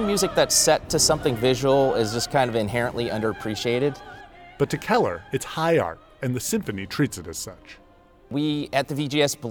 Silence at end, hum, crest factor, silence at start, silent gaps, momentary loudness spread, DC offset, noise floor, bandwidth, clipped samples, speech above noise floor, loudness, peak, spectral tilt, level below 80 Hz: 0 s; none; 18 dB; 0 s; none; 12 LU; under 0.1%; -53 dBFS; over 20 kHz; under 0.1%; 30 dB; -23 LUFS; -6 dBFS; -3.5 dB/octave; -48 dBFS